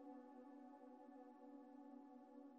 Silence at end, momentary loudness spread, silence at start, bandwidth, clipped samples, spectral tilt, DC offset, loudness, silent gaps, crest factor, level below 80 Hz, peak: 0 s; 2 LU; 0 s; 5.2 kHz; under 0.1%; -4.5 dB/octave; under 0.1%; -62 LUFS; none; 14 dB; under -90 dBFS; -48 dBFS